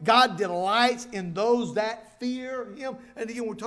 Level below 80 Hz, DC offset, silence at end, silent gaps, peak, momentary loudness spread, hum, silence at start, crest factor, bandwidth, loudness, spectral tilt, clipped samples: -66 dBFS; under 0.1%; 0 s; none; -6 dBFS; 14 LU; none; 0 s; 20 dB; 11 kHz; -26 LUFS; -4 dB/octave; under 0.1%